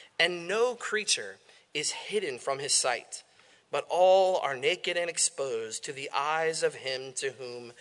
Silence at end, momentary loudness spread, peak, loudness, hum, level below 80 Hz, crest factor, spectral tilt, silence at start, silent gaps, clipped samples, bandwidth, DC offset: 0.1 s; 11 LU; -10 dBFS; -29 LUFS; none; -86 dBFS; 20 dB; -1 dB/octave; 0 s; none; under 0.1%; 11 kHz; under 0.1%